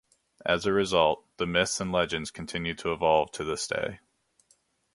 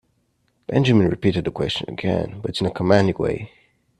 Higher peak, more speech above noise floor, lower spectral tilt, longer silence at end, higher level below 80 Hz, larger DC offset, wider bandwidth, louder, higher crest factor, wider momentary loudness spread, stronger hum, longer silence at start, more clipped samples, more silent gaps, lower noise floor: second, -8 dBFS vs 0 dBFS; second, 41 dB vs 47 dB; second, -3.5 dB/octave vs -7 dB/octave; first, 1 s vs 0.5 s; second, -54 dBFS vs -48 dBFS; neither; about the same, 11.5 kHz vs 11.5 kHz; second, -28 LUFS vs -21 LUFS; about the same, 22 dB vs 20 dB; about the same, 9 LU vs 10 LU; neither; second, 0.45 s vs 0.7 s; neither; neither; about the same, -68 dBFS vs -67 dBFS